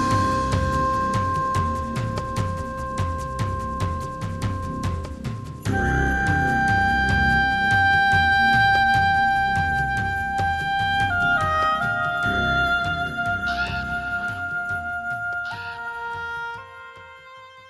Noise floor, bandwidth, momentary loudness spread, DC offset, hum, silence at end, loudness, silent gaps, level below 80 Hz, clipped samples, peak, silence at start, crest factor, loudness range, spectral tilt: -44 dBFS; 13.5 kHz; 13 LU; under 0.1%; none; 0 s; -22 LUFS; none; -36 dBFS; under 0.1%; -8 dBFS; 0 s; 14 dB; 10 LU; -5 dB/octave